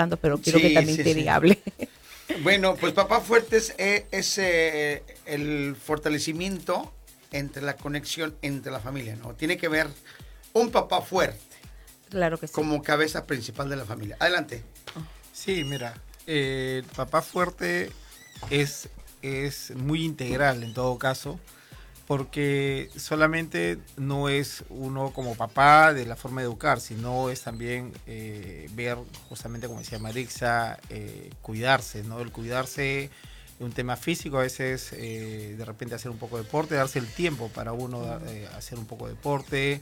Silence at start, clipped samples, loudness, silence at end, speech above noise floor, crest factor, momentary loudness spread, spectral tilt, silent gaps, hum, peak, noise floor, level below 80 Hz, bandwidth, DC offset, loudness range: 0 s; under 0.1%; -26 LUFS; 0 s; 22 dB; 22 dB; 18 LU; -4.5 dB/octave; none; none; -6 dBFS; -49 dBFS; -50 dBFS; 19 kHz; under 0.1%; 8 LU